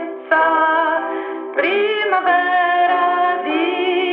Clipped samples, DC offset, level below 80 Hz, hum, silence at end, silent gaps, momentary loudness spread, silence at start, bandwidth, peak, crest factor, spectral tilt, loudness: under 0.1%; under 0.1%; -70 dBFS; none; 0 s; none; 5 LU; 0 s; 5 kHz; -2 dBFS; 16 dB; -6 dB/octave; -17 LUFS